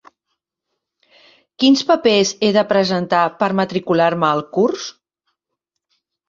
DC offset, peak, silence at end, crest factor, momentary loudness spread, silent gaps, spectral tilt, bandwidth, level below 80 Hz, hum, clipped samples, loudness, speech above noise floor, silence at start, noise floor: under 0.1%; -2 dBFS; 1.4 s; 16 dB; 5 LU; none; -4.5 dB/octave; 7.6 kHz; -62 dBFS; none; under 0.1%; -16 LUFS; 63 dB; 1.6 s; -79 dBFS